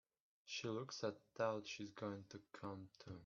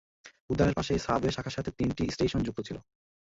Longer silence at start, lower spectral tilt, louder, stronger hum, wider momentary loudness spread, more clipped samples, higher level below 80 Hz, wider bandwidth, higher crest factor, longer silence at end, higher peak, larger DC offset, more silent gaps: first, 0.45 s vs 0.25 s; second, -4 dB/octave vs -6 dB/octave; second, -48 LUFS vs -30 LUFS; neither; first, 13 LU vs 10 LU; neither; second, -84 dBFS vs -46 dBFS; second, 7.2 kHz vs 8 kHz; about the same, 22 dB vs 20 dB; second, 0 s vs 0.5 s; second, -28 dBFS vs -12 dBFS; neither; second, none vs 0.41-0.48 s